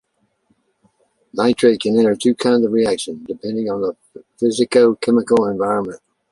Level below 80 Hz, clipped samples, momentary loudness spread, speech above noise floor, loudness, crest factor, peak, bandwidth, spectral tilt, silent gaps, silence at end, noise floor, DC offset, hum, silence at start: -58 dBFS; under 0.1%; 12 LU; 47 dB; -17 LUFS; 16 dB; -2 dBFS; 11.5 kHz; -5 dB/octave; none; 0.35 s; -64 dBFS; under 0.1%; none; 1.35 s